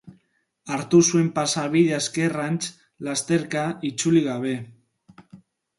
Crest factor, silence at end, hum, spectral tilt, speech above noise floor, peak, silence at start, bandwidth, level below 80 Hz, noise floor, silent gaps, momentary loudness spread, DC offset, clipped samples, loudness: 18 dB; 0.45 s; none; -4.5 dB/octave; 46 dB; -6 dBFS; 0.05 s; 11.5 kHz; -66 dBFS; -68 dBFS; none; 12 LU; under 0.1%; under 0.1%; -23 LUFS